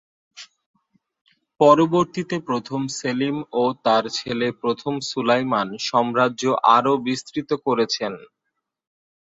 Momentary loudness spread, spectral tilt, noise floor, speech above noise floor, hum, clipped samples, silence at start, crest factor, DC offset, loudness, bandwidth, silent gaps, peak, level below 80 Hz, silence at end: 10 LU; -5 dB/octave; -79 dBFS; 58 dB; none; under 0.1%; 0.35 s; 20 dB; under 0.1%; -21 LUFS; 8 kHz; 0.66-0.74 s, 1.21-1.25 s; -2 dBFS; -64 dBFS; 1 s